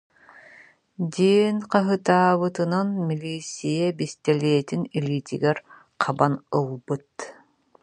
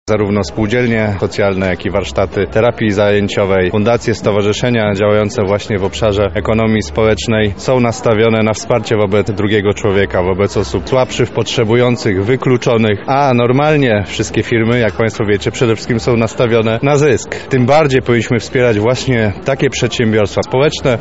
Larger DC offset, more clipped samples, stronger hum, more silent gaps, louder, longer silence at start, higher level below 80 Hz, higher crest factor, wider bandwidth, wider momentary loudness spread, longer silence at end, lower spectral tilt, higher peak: second, under 0.1% vs 1%; neither; neither; neither; second, -24 LUFS vs -13 LUFS; first, 1 s vs 0.05 s; second, -68 dBFS vs -34 dBFS; first, 20 dB vs 12 dB; first, 10.5 kHz vs 8.2 kHz; first, 12 LU vs 4 LU; first, 0.5 s vs 0 s; about the same, -6.5 dB/octave vs -6 dB/octave; second, -4 dBFS vs 0 dBFS